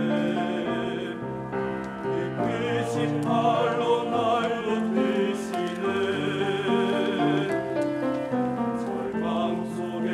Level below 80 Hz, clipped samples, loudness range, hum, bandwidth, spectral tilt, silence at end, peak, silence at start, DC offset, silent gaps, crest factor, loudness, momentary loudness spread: -60 dBFS; under 0.1%; 2 LU; none; 12.5 kHz; -6.5 dB/octave; 0 s; -10 dBFS; 0 s; under 0.1%; none; 16 dB; -26 LUFS; 6 LU